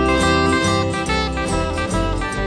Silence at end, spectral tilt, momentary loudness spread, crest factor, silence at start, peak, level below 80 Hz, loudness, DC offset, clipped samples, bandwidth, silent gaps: 0 s; -5 dB/octave; 5 LU; 14 dB; 0 s; -4 dBFS; -28 dBFS; -19 LUFS; under 0.1%; under 0.1%; 10.5 kHz; none